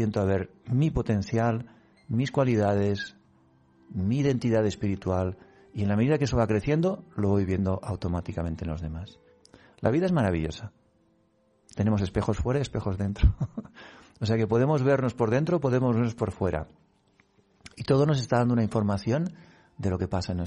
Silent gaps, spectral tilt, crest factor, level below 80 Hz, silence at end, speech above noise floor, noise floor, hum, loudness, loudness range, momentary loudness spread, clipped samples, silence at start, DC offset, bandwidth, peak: none; -7.5 dB/octave; 18 dB; -42 dBFS; 0 s; 40 dB; -66 dBFS; none; -27 LUFS; 4 LU; 11 LU; under 0.1%; 0 s; under 0.1%; 10.5 kHz; -8 dBFS